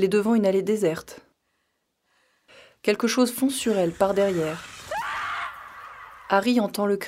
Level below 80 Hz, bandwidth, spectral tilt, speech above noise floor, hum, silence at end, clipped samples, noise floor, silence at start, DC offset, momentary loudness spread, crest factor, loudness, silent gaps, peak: -62 dBFS; 16 kHz; -5 dB/octave; 52 dB; none; 0 s; under 0.1%; -74 dBFS; 0 s; under 0.1%; 18 LU; 20 dB; -24 LUFS; none; -6 dBFS